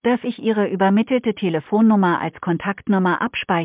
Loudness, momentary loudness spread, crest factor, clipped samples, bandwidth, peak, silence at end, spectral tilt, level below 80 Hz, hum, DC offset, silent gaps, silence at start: -19 LUFS; 7 LU; 12 dB; under 0.1%; 4 kHz; -6 dBFS; 0 s; -11 dB/octave; -58 dBFS; none; under 0.1%; none; 0.05 s